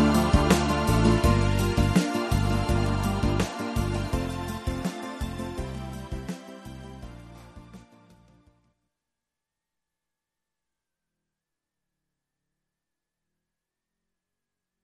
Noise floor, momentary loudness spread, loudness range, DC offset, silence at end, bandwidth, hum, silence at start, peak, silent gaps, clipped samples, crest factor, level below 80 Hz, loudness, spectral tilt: -87 dBFS; 21 LU; 20 LU; under 0.1%; 7.05 s; 13.5 kHz; none; 0 s; -6 dBFS; none; under 0.1%; 22 dB; -36 dBFS; -26 LUFS; -6 dB/octave